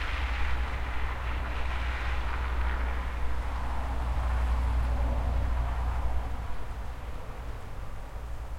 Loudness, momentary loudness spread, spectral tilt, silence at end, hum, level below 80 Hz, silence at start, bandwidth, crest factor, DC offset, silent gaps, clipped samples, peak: -34 LUFS; 11 LU; -6 dB/octave; 0 s; none; -32 dBFS; 0 s; 9.8 kHz; 12 dB; under 0.1%; none; under 0.1%; -16 dBFS